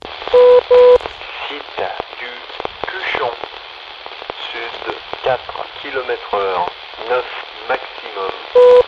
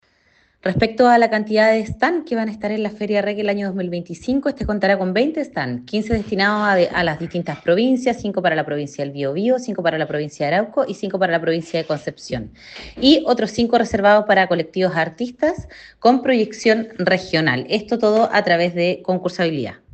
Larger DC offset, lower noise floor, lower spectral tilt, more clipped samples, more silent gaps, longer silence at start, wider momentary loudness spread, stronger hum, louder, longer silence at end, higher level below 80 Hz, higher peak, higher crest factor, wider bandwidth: neither; second, -33 dBFS vs -59 dBFS; second, -4 dB/octave vs -6 dB/octave; neither; neither; second, 0.05 s vs 0.65 s; first, 19 LU vs 10 LU; neither; first, -16 LUFS vs -19 LUFS; second, 0 s vs 0.2 s; about the same, -50 dBFS vs -46 dBFS; about the same, 0 dBFS vs 0 dBFS; about the same, 16 dB vs 18 dB; second, 6 kHz vs 8.6 kHz